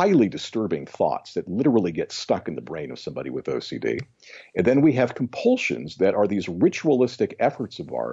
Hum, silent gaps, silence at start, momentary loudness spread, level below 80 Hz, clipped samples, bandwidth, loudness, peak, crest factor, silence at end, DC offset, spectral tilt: none; none; 0 s; 12 LU; -60 dBFS; under 0.1%; 8 kHz; -24 LUFS; -8 dBFS; 16 dB; 0 s; under 0.1%; -6.5 dB/octave